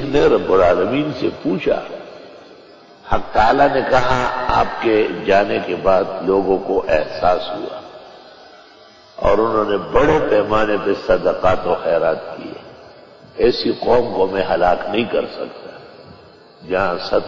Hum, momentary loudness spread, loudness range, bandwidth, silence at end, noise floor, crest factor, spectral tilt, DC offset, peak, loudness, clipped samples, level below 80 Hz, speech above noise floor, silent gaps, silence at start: none; 15 LU; 4 LU; 7.6 kHz; 0 s; -45 dBFS; 14 dB; -6.5 dB/octave; under 0.1%; -4 dBFS; -17 LUFS; under 0.1%; -38 dBFS; 28 dB; none; 0 s